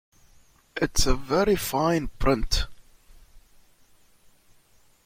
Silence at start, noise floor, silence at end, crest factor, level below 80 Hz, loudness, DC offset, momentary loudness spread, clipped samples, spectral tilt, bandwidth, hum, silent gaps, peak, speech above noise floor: 0.75 s; -59 dBFS; 1.65 s; 20 dB; -34 dBFS; -25 LUFS; under 0.1%; 7 LU; under 0.1%; -4 dB/octave; 16.5 kHz; none; none; -6 dBFS; 36 dB